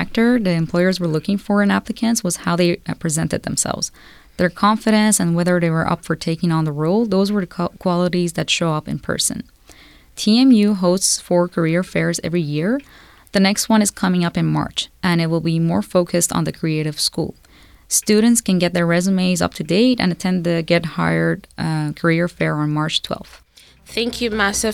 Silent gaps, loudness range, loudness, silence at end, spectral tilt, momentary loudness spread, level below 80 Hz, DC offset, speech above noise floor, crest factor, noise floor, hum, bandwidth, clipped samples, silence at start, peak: none; 3 LU; -18 LUFS; 0 s; -4.5 dB/octave; 7 LU; -46 dBFS; under 0.1%; 29 dB; 14 dB; -46 dBFS; none; 16 kHz; under 0.1%; 0 s; -4 dBFS